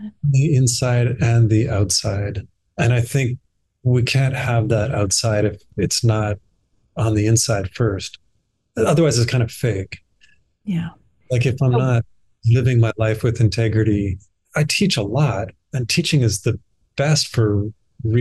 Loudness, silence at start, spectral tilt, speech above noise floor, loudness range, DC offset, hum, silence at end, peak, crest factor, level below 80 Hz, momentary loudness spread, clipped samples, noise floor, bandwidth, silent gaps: -19 LUFS; 0 s; -5 dB/octave; 49 dB; 3 LU; 0.2%; none; 0 s; -6 dBFS; 12 dB; -44 dBFS; 12 LU; under 0.1%; -67 dBFS; 12.5 kHz; none